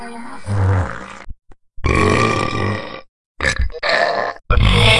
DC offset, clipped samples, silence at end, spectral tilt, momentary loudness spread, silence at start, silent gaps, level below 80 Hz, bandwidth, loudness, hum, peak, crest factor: under 0.1%; under 0.1%; 0 s; -5 dB/octave; 17 LU; 0 s; 3.09-3.35 s; -26 dBFS; 12 kHz; -18 LUFS; none; 0 dBFS; 18 dB